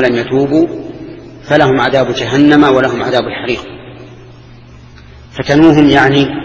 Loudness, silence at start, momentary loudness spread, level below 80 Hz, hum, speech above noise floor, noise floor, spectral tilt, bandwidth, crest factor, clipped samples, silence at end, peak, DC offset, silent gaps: -10 LUFS; 0 s; 22 LU; -38 dBFS; none; 26 dB; -35 dBFS; -6.5 dB/octave; 8 kHz; 12 dB; 0.9%; 0 s; 0 dBFS; under 0.1%; none